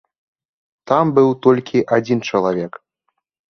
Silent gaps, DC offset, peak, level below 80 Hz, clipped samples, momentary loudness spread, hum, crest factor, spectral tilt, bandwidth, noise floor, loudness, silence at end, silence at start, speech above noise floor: none; under 0.1%; -2 dBFS; -60 dBFS; under 0.1%; 7 LU; none; 16 dB; -7 dB/octave; 6.6 kHz; -72 dBFS; -16 LUFS; 0.9 s; 0.85 s; 57 dB